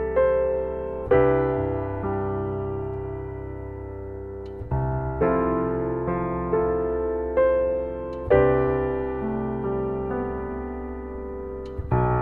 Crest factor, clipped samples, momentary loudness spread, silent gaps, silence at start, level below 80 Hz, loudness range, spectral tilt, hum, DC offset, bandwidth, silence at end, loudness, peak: 18 dB; under 0.1%; 13 LU; none; 0 s; -38 dBFS; 6 LU; -11 dB/octave; none; under 0.1%; 4.3 kHz; 0 s; -25 LUFS; -6 dBFS